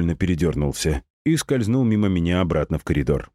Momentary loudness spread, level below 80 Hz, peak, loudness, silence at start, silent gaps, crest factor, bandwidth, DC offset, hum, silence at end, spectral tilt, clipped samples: 4 LU; -34 dBFS; -6 dBFS; -22 LUFS; 0 s; 1.10-1.25 s; 14 dB; 15.5 kHz; under 0.1%; none; 0.1 s; -6.5 dB/octave; under 0.1%